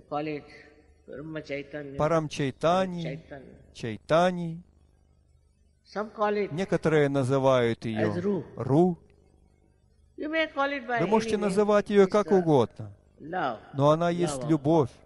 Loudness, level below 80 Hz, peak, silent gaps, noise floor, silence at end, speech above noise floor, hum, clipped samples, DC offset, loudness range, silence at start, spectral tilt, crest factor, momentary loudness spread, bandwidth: -26 LUFS; -58 dBFS; -8 dBFS; none; -64 dBFS; 0.2 s; 38 dB; none; under 0.1%; under 0.1%; 6 LU; 0.1 s; -6.5 dB/octave; 20 dB; 16 LU; 12 kHz